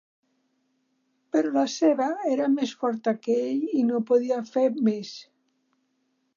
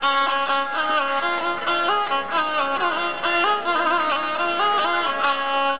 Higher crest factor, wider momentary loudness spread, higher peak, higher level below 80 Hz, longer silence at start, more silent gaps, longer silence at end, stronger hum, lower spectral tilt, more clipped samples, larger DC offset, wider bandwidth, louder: about the same, 16 dB vs 14 dB; about the same, 5 LU vs 3 LU; about the same, -10 dBFS vs -8 dBFS; second, -86 dBFS vs -68 dBFS; first, 1.35 s vs 0 s; neither; first, 1.15 s vs 0 s; neither; about the same, -5.5 dB/octave vs -6 dB/octave; neither; second, under 0.1% vs 1%; first, 7.4 kHz vs 5.2 kHz; second, -25 LUFS vs -21 LUFS